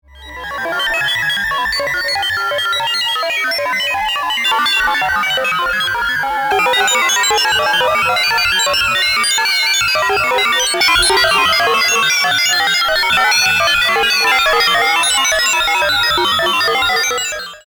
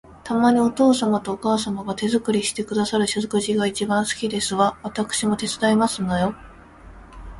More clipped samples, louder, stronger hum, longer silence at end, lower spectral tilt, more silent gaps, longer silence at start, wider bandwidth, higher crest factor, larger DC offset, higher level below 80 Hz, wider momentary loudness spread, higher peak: neither; first, -13 LUFS vs -21 LUFS; neither; about the same, 0.1 s vs 0 s; second, 0 dB/octave vs -4.5 dB/octave; neither; about the same, 0.15 s vs 0.1 s; first, over 20 kHz vs 11.5 kHz; about the same, 14 dB vs 16 dB; neither; first, -42 dBFS vs -48 dBFS; about the same, 5 LU vs 7 LU; first, -2 dBFS vs -6 dBFS